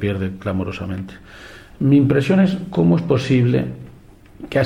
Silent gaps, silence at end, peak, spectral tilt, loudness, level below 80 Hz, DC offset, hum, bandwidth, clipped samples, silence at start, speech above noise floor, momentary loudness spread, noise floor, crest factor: none; 0 s; -2 dBFS; -8 dB/octave; -18 LUFS; -46 dBFS; under 0.1%; none; 10.5 kHz; under 0.1%; 0 s; 26 dB; 22 LU; -44 dBFS; 16 dB